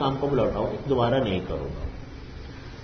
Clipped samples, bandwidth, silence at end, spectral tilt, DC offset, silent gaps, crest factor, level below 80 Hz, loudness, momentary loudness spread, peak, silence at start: under 0.1%; 6.6 kHz; 0 s; -8 dB/octave; under 0.1%; none; 16 dB; -40 dBFS; -26 LUFS; 18 LU; -12 dBFS; 0 s